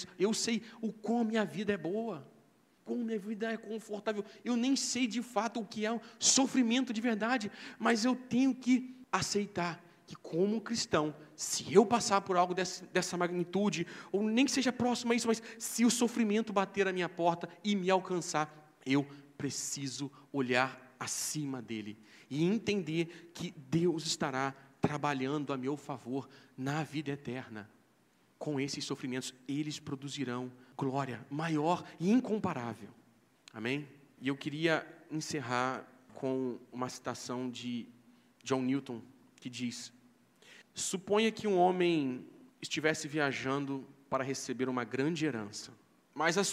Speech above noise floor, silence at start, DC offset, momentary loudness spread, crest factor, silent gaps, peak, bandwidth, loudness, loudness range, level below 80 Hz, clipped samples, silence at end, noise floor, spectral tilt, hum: 35 dB; 0 s; under 0.1%; 13 LU; 24 dB; none; -10 dBFS; 15.5 kHz; -34 LUFS; 8 LU; -76 dBFS; under 0.1%; 0 s; -69 dBFS; -4 dB/octave; none